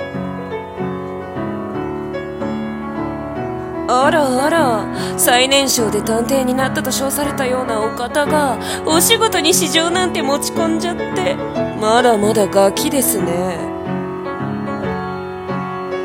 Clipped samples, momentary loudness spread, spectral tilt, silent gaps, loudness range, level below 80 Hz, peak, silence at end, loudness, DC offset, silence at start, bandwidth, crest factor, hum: under 0.1%; 12 LU; -3.5 dB/octave; none; 6 LU; -44 dBFS; 0 dBFS; 0 s; -17 LUFS; under 0.1%; 0 s; 17 kHz; 18 dB; none